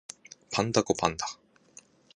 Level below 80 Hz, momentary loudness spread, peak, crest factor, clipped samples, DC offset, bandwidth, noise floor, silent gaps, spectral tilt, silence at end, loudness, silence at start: -58 dBFS; 21 LU; -6 dBFS; 26 dB; under 0.1%; under 0.1%; 11 kHz; -57 dBFS; none; -4 dB/octave; 0.8 s; -29 LUFS; 0.5 s